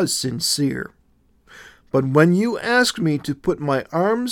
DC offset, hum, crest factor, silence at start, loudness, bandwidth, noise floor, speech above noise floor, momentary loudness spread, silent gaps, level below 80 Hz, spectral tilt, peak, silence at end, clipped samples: under 0.1%; none; 18 dB; 0 s; -20 LUFS; 18 kHz; -59 dBFS; 39 dB; 8 LU; none; -54 dBFS; -4.5 dB/octave; -2 dBFS; 0 s; under 0.1%